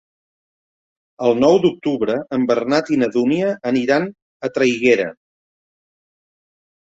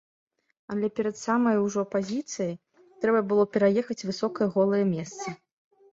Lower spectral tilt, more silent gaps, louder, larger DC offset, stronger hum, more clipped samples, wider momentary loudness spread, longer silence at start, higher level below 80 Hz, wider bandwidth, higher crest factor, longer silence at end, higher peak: about the same, -6 dB/octave vs -6 dB/octave; first, 4.22-4.40 s vs none; first, -18 LUFS vs -27 LUFS; neither; neither; neither; second, 7 LU vs 12 LU; first, 1.2 s vs 0.7 s; first, -60 dBFS vs -68 dBFS; about the same, 8 kHz vs 8 kHz; about the same, 18 dB vs 16 dB; first, 1.8 s vs 0.6 s; first, -2 dBFS vs -10 dBFS